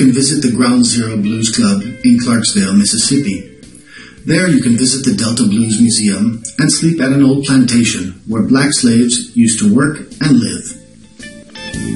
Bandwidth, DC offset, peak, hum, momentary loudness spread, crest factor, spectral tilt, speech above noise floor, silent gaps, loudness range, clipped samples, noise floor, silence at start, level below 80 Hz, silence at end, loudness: 11.5 kHz; 0.3%; 0 dBFS; none; 10 LU; 12 dB; -4 dB/octave; 25 dB; none; 2 LU; under 0.1%; -37 dBFS; 0 s; -46 dBFS; 0 s; -12 LUFS